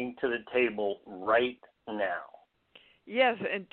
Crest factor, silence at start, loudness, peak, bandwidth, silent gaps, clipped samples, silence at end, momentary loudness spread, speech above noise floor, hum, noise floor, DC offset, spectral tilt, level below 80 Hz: 20 dB; 0 s; -30 LUFS; -12 dBFS; 4.4 kHz; none; under 0.1%; 0.1 s; 11 LU; 31 dB; none; -61 dBFS; under 0.1%; -1.5 dB/octave; -70 dBFS